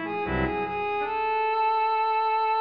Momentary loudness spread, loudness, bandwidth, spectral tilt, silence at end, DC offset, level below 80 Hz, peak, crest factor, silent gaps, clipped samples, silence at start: 4 LU; -26 LUFS; 5.2 kHz; -8 dB/octave; 0 s; 0.2%; -46 dBFS; -14 dBFS; 10 dB; none; under 0.1%; 0 s